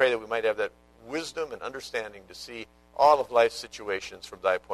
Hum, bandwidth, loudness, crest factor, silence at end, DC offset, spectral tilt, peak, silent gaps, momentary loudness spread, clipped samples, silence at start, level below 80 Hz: none; 13.5 kHz; -27 LUFS; 22 dB; 0 s; under 0.1%; -3 dB/octave; -6 dBFS; none; 19 LU; under 0.1%; 0 s; -62 dBFS